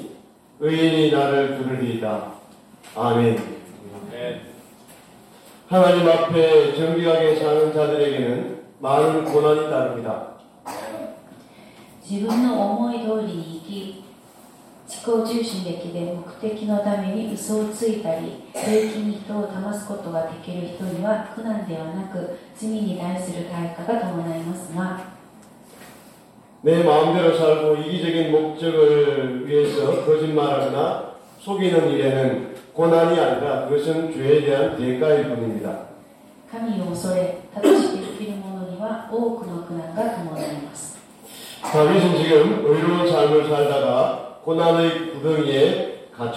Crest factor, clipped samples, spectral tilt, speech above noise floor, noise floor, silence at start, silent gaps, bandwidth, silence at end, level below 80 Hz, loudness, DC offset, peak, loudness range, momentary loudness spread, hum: 18 dB; under 0.1%; -6 dB/octave; 29 dB; -49 dBFS; 0 s; none; 14.5 kHz; 0 s; -64 dBFS; -21 LUFS; under 0.1%; -4 dBFS; 9 LU; 16 LU; none